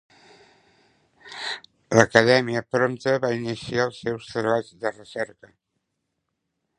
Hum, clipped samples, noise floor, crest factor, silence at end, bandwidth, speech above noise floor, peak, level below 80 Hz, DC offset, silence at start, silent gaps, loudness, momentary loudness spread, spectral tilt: none; under 0.1%; -78 dBFS; 26 dB; 1.55 s; 11 kHz; 56 dB; 0 dBFS; -62 dBFS; under 0.1%; 1.25 s; none; -23 LUFS; 15 LU; -5 dB/octave